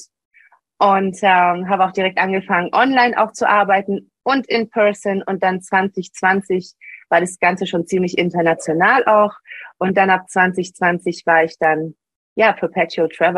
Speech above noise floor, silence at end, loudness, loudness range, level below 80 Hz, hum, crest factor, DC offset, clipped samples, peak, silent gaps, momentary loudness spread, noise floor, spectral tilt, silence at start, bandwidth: 21 dB; 0 s; -17 LUFS; 3 LU; -64 dBFS; none; 16 dB; under 0.1%; under 0.1%; 0 dBFS; 0.25-0.31 s, 12.16-12.36 s; 8 LU; -37 dBFS; -5 dB/octave; 0 s; 12 kHz